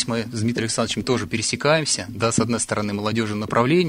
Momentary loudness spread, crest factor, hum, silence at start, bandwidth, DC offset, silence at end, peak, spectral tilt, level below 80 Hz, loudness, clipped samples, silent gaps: 5 LU; 20 dB; none; 0 s; 16 kHz; under 0.1%; 0 s; -2 dBFS; -4 dB/octave; -52 dBFS; -22 LUFS; under 0.1%; none